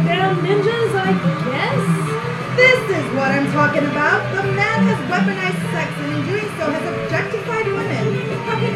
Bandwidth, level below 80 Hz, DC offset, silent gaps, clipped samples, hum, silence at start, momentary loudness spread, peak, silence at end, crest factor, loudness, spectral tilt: 13.5 kHz; -52 dBFS; under 0.1%; none; under 0.1%; none; 0 s; 6 LU; 0 dBFS; 0 s; 16 dB; -18 LUFS; -6 dB/octave